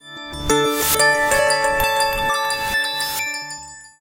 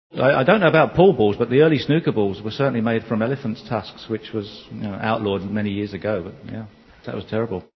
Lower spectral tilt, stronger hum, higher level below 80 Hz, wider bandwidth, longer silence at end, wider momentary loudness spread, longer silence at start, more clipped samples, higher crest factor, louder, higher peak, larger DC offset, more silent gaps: second, -1.5 dB/octave vs -8.5 dB/octave; neither; first, -40 dBFS vs -50 dBFS; first, 17 kHz vs 6.2 kHz; about the same, 0.15 s vs 0.15 s; second, 14 LU vs 17 LU; about the same, 0.05 s vs 0.15 s; neither; about the same, 16 dB vs 20 dB; about the same, -18 LUFS vs -20 LUFS; second, -4 dBFS vs 0 dBFS; neither; neither